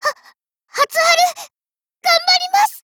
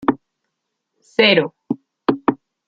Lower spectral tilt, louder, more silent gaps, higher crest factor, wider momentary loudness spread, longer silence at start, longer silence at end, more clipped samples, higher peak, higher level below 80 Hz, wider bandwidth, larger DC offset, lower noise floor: second, 2.5 dB/octave vs -6.5 dB/octave; first, -15 LUFS vs -18 LUFS; neither; second, 14 dB vs 20 dB; second, 12 LU vs 15 LU; about the same, 0 s vs 0 s; second, 0.05 s vs 0.35 s; neither; about the same, -2 dBFS vs -2 dBFS; second, -72 dBFS vs -56 dBFS; first, over 20 kHz vs 7.6 kHz; neither; first, under -90 dBFS vs -77 dBFS